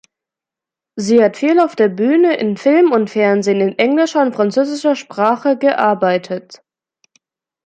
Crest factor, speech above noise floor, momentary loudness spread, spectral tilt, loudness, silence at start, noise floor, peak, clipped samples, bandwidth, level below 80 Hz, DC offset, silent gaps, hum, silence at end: 14 dB; 73 dB; 6 LU; -5.5 dB/octave; -14 LUFS; 0.95 s; -86 dBFS; -2 dBFS; under 0.1%; 9.2 kHz; -66 dBFS; under 0.1%; none; none; 1.1 s